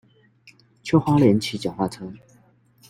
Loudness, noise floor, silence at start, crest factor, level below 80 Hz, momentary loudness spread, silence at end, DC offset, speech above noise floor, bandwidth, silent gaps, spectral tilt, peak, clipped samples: -21 LUFS; -57 dBFS; 0.85 s; 20 dB; -56 dBFS; 20 LU; 0.75 s; under 0.1%; 37 dB; 16 kHz; none; -7 dB/octave; -4 dBFS; under 0.1%